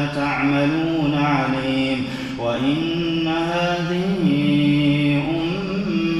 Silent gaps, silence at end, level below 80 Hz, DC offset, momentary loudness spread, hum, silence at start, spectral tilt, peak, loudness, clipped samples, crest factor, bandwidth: none; 0 s; -46 dBFS; under 0.1%; 5 LU; none; 0 s; -7 dB/octave; -6 dBFS; -20 LUFS; under 0.1%; 14 dB; 11 kHz